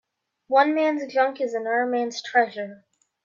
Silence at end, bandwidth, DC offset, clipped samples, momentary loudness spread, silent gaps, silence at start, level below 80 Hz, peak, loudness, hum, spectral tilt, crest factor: 0.5 s; 7.4 kHz; under 0.1%; under 0.1%; 8 LU; none; 0.5 s; -84 dBFS; -6 dBFS; -23 LUFS; none; -3.5 dB/octave; 18 dB